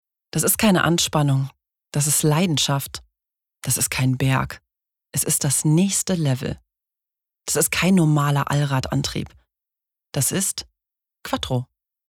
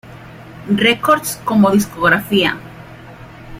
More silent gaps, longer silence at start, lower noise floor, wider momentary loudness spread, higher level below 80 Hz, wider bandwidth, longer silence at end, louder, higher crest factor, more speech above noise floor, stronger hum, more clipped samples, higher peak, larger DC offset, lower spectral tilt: neither; first, 0.35 s vs 0.05 s; first, -87 dBFS vs -36 dBFS; second, 14 LU vs 22 LU; about the same, -48 dBFS vs -46 dBFS; first, 18 kHz vs 16 kHz; first, 0.45 s vs 0 s; second, -20 LUFS vs -14 LUFS; about the same, 16 dB vs 16 dB; first, 67 dB vs 22 dB; neither; neither; second, -6 dBFS vs 0 dBFS; neither; about the same, -4 dB/octave vs -4.5 dB/octave